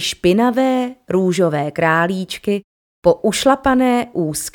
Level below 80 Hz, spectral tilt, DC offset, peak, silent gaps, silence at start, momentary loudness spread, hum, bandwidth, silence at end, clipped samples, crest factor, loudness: -46 dBFS; -5 dB/octave; under 0.1%; 0 dBFS; 2.64-3.02 s; 0 s; 7 LU; none; 18.5 kHz; 0.05 s; under 0.1%; 16 dB; -17 LUFS